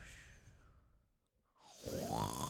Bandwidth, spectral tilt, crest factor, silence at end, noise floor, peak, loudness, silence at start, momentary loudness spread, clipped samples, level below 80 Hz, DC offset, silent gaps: 19 kHz; -4.5 dB/octave; 22 dB; 0 s; -80 dBFS; -24 dBFS; -44 LUFS; 0 s; 23 LU; under 0.1%; -62 dBFS; under 0.1%; none